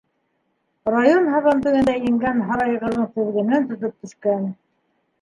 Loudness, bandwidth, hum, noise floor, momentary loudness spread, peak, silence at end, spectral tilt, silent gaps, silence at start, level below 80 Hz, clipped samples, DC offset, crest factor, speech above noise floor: -20 LUFS; 10 kHz; none; -70 dBFS; 10 LU; -4 dBFS; 0.7 s; -7 dB/octave; none; 0.85 s; -54 dBFS; under 0.1%; under 0.1%; 18 dB; 51 dB